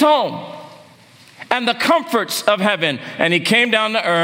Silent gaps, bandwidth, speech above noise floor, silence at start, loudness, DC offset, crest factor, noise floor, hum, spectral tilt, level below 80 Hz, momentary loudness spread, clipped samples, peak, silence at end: none; 16.5 kHz; 29 dB; 0 s; -16 LUFS; under 0.1%; 18 dB; -46 dBFS; none; -3.5 dB/octave; -70 dBFS; 10 LU; under 0.1%; 0 dBFS; 0 s